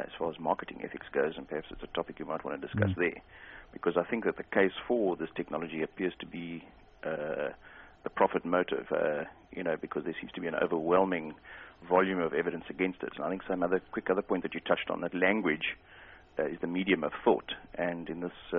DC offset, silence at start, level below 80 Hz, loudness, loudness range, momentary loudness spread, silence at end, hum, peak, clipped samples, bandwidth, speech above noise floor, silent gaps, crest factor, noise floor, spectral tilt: under 0.1%; 0 s; -62 dBFS; -32 LUFS; 3 LU; 14 LU; 0 s; none; -10 dBFS; under 0.1%; 4 kHz; 22 dB; none; 22 dB; -54 dBFS; -4 dB/octave